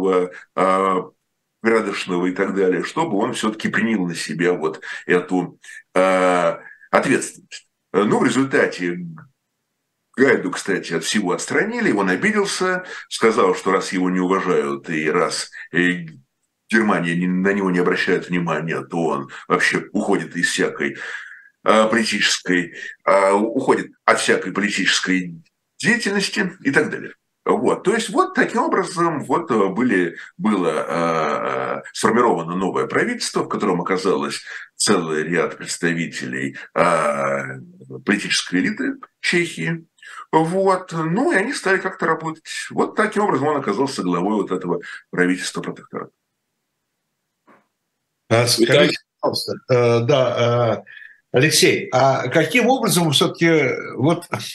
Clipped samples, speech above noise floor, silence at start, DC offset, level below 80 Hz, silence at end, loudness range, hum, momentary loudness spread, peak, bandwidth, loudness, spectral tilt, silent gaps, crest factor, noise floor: under 0.1%; 56 dB; 0 s; under 0.1%; -66 dBFS; 0 s; 4 LU; none; 10 LU; 0 dBFS; 12.5 kHz; -19 LUFS; -4.5 dB/octave; none; 20 dB; -75 dBFS